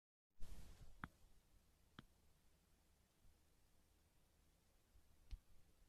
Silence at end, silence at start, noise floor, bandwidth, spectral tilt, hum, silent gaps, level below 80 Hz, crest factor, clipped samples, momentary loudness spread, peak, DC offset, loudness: 0 s; 0.35 s; -77 dBFS; 14 kHz; -4.5 dB/octave; none; none; -66 dBFS; 28 dB; under 0.1%; 8 LU; -32 dBFS; under 0.1%; -64 LUFS